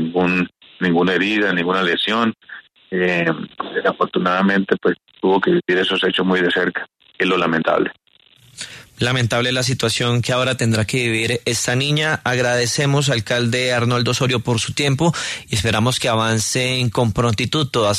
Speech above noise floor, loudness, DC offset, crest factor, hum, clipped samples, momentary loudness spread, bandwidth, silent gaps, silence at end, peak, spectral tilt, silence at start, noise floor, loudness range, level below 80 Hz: 34 dB; -18 LUFS; under 0.1%; 16 dB; none; under 0.1%; 6 LU; 13.5 kHz; none; 0 s; -2 dBFS; -4.5 dB/octave; 0 s; -52 dBFS; 2 LU; -48 dBFS